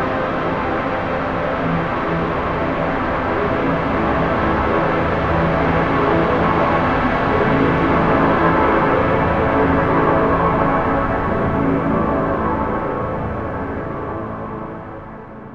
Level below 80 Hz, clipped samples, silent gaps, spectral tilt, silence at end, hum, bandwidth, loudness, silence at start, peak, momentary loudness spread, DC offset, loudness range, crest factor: -32 dBFS; under 0.1%; none; -8.5 dB/octave; 0 s; none; 7.4 kHz; -18 LUFS; 0 s; -2 dBFS; 10 LU; under 0.1%; 5 LU; 16 dB